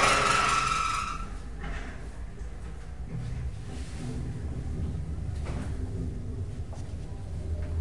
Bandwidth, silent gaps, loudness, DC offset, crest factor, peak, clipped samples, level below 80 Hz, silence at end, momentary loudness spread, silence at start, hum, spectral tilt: 11.5 kHz; none; -32 LUFS; 0.7%; 20 dB; -10 dBFS; under 0.1%; -38 dBFS; 0 s; 17 LU; 0 s; none; -4 dB/octave